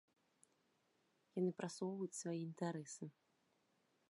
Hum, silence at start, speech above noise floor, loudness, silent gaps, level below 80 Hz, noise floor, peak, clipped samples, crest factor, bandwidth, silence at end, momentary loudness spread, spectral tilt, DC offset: none; 1.35 s; 36 dB; -46 LUFS; none; under -90 dBFS; -81 dBFS; -30 dBFS; under 0.1%; 20 dB; 11.5 kHz; 1 s; 10 LU; -5.5 dB/octave; under 0.1%